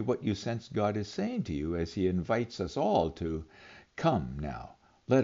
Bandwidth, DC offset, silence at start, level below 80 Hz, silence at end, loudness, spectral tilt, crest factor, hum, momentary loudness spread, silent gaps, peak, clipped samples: 7.6 kHz; under 0.1%; 0 s; -54 dBFS; 0 s; -32 LUFS; -6.5 dB/octave; 18 dB; none; 16 LU; none; -14 dBFS; under 0.1%